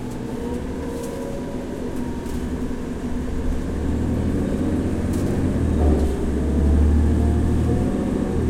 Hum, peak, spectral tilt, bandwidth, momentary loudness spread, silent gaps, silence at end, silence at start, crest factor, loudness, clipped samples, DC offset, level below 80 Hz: none; -6 dBFS; -8 dB/octave; 13.5 kHz; 10 LU; none; 0 s; 0 s; 16 dB; -23 LUFS; under 0.1%; under 0.1%; -26 dBFS